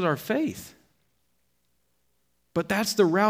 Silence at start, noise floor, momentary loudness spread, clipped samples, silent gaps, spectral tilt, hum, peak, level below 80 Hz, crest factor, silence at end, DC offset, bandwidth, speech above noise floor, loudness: 0 s; -74 dBFS; 17 LU; under 0.1%; none; -5 dB/octave; 60 Hz at -70 dBFS; -8 dBFS; -66 dBFS; 20 dB; 0 s; under 0.1%; 16.5 kHz; 49 dB; -26 LUFS